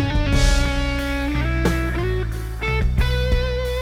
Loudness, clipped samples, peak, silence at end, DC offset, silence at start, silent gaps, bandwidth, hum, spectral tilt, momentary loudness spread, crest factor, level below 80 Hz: -22 LUFS; under 0.1%; -4 dBFS; 0 s; under 0.1%; 0 s; none; 16 kHz; none; -5.5 dB/octave; 5 LU; 16 dB; -22 dBFS